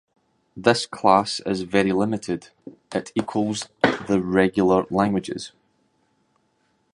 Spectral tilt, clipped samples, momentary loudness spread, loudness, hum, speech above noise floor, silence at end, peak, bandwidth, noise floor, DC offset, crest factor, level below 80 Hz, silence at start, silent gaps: -5.5 dB/octave; under 0.1%; 12 LU; -22 LUFS; none; 46 dB; 1.45 s; -2 dBFS; 11.5 kHz; -67 dBFS; under 0.1%; 22 dB; -54 dBFS; 0.55 s; none